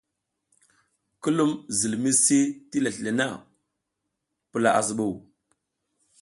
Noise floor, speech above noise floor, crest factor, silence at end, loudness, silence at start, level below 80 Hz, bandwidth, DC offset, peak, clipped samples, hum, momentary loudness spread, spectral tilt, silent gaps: -81 dBFS; 57 dB; 20 dB; 1 s; -24 LUFS; 1.25 s; -66 dBFS; 11.5 kHz; under 0.1%; -6 dBFS; under 0.1%; none; 12 LU; -3.5 dB/octave; none